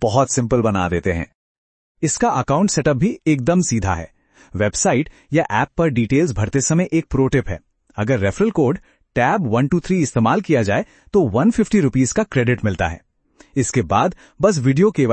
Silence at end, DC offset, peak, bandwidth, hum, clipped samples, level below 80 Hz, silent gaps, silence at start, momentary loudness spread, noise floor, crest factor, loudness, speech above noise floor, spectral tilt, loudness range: 0 s; under 0.1%; -2 dBFS; 8.8 kHz; none; under 0.1%; -40 dBFS; 1.35-1.95 s; 0 s; 8 LU; -52 dBFS; 16 dB; -18 LUFS; 35 dB; -5.5 dB/octave; 2 LU